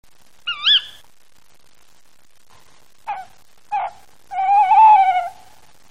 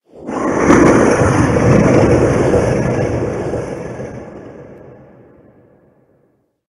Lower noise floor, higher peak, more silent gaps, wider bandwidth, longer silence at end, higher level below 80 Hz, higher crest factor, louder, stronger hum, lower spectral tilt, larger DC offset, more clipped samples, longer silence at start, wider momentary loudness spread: about the same, -58 dBFS vs -59 dBFS; second, -4 dBFS vs 0 dBFS; neither; second, 10 kHz vs 12 kHz; second, 0.6 s vs 1.9 s; second, -64 dBFS vs -32 dBFS; about the same, 16 dB vs 14 dB; about the same, -15 LUFS vs -13 LUFS; neither; second, 0 dB/octave vs -7 dB/octave; first, 0.7% vs under 0.1%; neither; first, 0.45 s vs 0.15 s; first, 22 LU vs 19 LU